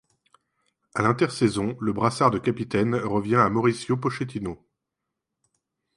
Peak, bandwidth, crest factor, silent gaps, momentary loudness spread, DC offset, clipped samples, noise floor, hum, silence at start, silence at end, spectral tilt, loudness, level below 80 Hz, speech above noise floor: -4 dBFS; 11.5 kHz; 20 dB; none; 10 LU; under 0.1%; under 0.1%; -84 dBFS; none; 0.95 s; 1.4 s; -6.5 dB/octave; -24 LUFS; -56 dBFS; 60 dB